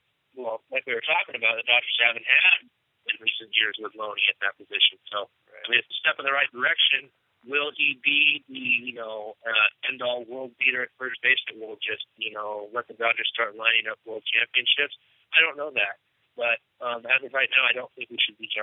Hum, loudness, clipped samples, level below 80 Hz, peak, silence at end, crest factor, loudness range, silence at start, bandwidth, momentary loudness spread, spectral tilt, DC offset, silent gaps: none; -23 LUFS; under 0.1%; under -90 dBFS; -2 dBFS; 0 s; 24 dB; 4 LU; 0.35 s; 4 kHz; 14 LU; -4.5 dB/octave; under 0.1%; none